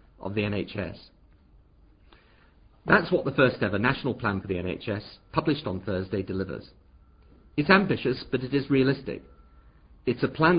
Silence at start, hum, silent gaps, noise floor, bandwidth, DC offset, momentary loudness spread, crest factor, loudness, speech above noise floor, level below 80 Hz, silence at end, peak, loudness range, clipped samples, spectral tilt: 0.2 s; none; none; -57 dBFS; 5.2 kHz; under 0.1%; 14 LU; 24 dB; -27 LUFS; 31 dB; -50 dBFS; 0 s; -4 dBFS; 4 LU; under 0.1%; -10.5 dB/octave